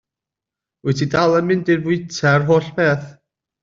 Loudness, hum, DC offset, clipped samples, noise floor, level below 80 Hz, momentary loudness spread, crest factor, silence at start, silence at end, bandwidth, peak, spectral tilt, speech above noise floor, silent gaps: -18 LUFS; none; under 0.1%; under 0.1%; -86 dBFS; -54 dBFS; 7 LU; 16 dB; 0.85 s; 0.5 s; 7.6 kHz; -4 dBFS; -6.5 dB/octave; 69 dB; none